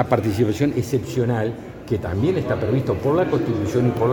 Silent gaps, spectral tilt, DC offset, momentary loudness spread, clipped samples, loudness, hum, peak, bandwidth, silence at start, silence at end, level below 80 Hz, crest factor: none; -7.5 dB/octave; under 0.1%; 6 LU; under 0.1%; -21 LUFS; none; -2 dBFS; 19 kHz; 0 s; 0 s; -44 dBFS; 18 dB